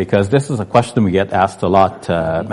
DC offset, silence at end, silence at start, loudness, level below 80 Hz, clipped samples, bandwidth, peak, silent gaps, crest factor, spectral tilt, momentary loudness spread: under 0.1%; 0 s; 0 s; -15 LUFS; -44 dBFS; under 0.1%; 11.5 kHz; 0 dBFS; none; 14 dB; -7 dB/octave; 4 LU